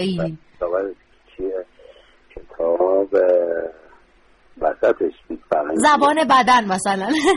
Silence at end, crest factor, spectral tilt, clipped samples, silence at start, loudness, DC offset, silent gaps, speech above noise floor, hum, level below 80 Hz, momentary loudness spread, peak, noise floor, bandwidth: 0 s; 16 dB; -4.5 dB/octave; under 0.1%; 0 s; -19 LUFS; under 0.1%; none; 36 dB; none; -50 dBFS; 14 LU; -4 dBFS; -54 dBFS; 11.5 kHz